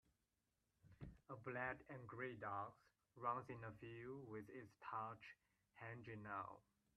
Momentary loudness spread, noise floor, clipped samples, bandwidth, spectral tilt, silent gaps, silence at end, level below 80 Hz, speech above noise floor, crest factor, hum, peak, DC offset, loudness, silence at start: 12 LU; -90 dBFS; under 0.1%; 10 kHz; -7.5 dB/octave; none; 0.4 s; -78 dBFS; 37 dB; 22 dB; none; -32 dBFS; under 0.1%; -53 LUFS; 0.85 s